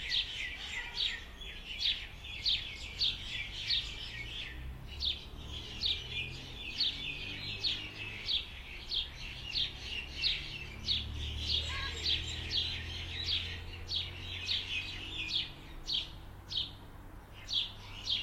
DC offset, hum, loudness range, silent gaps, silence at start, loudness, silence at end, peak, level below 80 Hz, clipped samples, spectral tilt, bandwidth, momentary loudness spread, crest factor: under 0.1%; none; 2 LU; none; 0 s; -35 LUFS; 0 s; -18 dBFS; -50 dBFS; under 0.1%; -2.5 dB/octave; 16.5 kHz; 11 LU; 20 dB